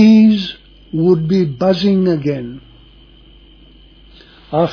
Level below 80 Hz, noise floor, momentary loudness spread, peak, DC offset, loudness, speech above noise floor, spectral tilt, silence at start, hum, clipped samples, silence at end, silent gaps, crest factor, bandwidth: -46 dBFS; -43 dBFS; 17 LU; 0 dBFS; under 0.1%; -15 LUFS; 29 dB; -8.5 dB/octave; 0 s; none; under 0.1%; 0 s; none; 14 dB; 5.4 kHz